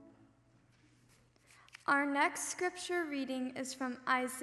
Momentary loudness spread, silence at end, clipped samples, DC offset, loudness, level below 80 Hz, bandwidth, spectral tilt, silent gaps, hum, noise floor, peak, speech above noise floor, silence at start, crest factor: 8 LU; 0 s; under 0.1%; under 0.1%; -35 LUFS; -78 dBFS; 12.5 kHz; -2 dB/octave; none; none; -68 dBFS; -18 dBFS; 32 dB; 0 s; 20 dB